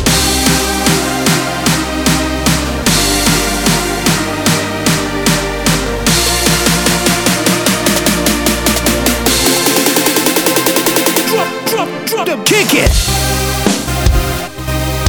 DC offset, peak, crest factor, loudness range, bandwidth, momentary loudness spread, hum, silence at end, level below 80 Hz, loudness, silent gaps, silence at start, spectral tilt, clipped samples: under 0.1%; 0 dBFS; 12 dB; 2 LU; over 20 kHz; 4 LU; none; 0 s; -22 dBFS; -12 LUFS; none; 0 s; -3 dB/octave; under 0.1%